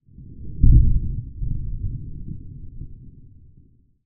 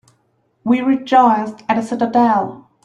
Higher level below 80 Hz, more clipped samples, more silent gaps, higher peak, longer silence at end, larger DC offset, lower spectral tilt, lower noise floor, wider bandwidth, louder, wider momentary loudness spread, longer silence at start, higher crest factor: first, -24 dBFS vs -60 dBFS; neither; neither; about the same, 0 dBFS vs -2 dBFS; first, 0.95 s vs 0.25 s; neither; first, -25.5 dB/octave vs -6.5 dB/octave; second, -54 dBFS vs -62 dBFS; second, 0.5 kHz vs 10.5 kHz; second, -23 LUFS vs -16 LUFS; first, 24 LU vs 8 LU; second, 0.2 s vs 0.65 s; first, 20 dB vs 14 dB